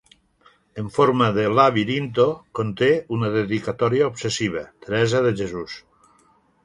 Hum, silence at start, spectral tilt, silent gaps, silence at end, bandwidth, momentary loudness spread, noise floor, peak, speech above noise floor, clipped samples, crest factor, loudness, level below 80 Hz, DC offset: none; 0.75 s; -6 dB/octave; none; 0.85 s; 11.5 kHz; 14 LU; -59 dBFS; -2 dBFS; 39 dB; under 0.1%; 20 dB; -21 LUFS; -54 dBFS; under 0.1%